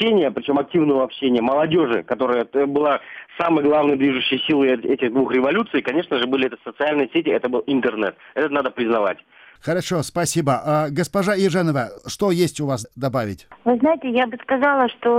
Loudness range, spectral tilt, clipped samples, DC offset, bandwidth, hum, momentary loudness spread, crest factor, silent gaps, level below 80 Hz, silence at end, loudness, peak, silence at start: 3 LU; -5.5 dB/octave; under 0.1%; under 0.1%; 16 kHz; none; 7 LU; 14 dB; none; -58 dBFS; 0 s; -20 LUFS; -6 dBFS; 0 s